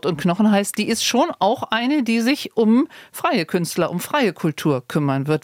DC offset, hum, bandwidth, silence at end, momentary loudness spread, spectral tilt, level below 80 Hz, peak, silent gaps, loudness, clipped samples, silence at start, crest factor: under 0.1%; none; 18 kHz; 0.05 s; 5 LU; -5 dB/octave; -64 dBFS; -6 dBFS; none; -20 LUFS; under 0.1%; 0.05 s; 14 dB